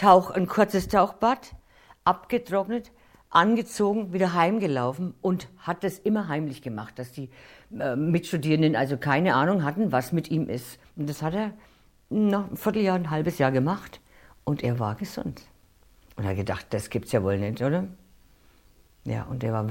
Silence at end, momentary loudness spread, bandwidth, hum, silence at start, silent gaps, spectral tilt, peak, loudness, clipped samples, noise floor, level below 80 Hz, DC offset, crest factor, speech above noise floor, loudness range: 0 s; 13 LU; 17 kHz; none; 0 s; none; -6.5 dB/octave; -4 dBFS; -26 LUFS; under 0.1%; -58 dBFS; -54 dBFS; under 0.1%; 22 dB; 33 dB; 5 LU